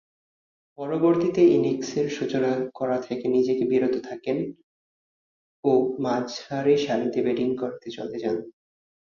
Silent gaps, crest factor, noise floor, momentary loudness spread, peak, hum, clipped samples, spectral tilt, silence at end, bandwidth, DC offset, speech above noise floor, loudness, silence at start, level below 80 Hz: 4.63-5.63 s; 18 dB; under -90 dBFS; 10 LU; -8 dBFS; none; under 0.1%; -6.5 dB/octave; 0.65 s; 7.2 kHz; under 0.1%; over 66 dB; -24 LUFS; 0.8 s; -66 dBFS